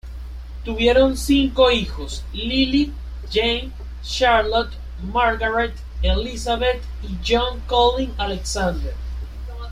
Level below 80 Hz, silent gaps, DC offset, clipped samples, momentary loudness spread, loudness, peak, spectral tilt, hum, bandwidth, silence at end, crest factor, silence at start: -28 dBFS; none; under 0.1%; under 0.1%; 16 LU; -20 LUFS; -4 dBFS; -4.5 dB/octave; none; 14.5 kHz; 0 s; 16 dB; 0.05 s